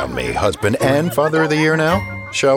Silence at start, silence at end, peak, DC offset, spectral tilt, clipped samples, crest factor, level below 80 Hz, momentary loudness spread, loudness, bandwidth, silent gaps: 0 s; 0 s; -4 dBFS; under 0.1%; -5 dB/octave; under 0.1%; 14 dB; -40 dBFS; 6 LU; -17 LUFS; 18 kHz; none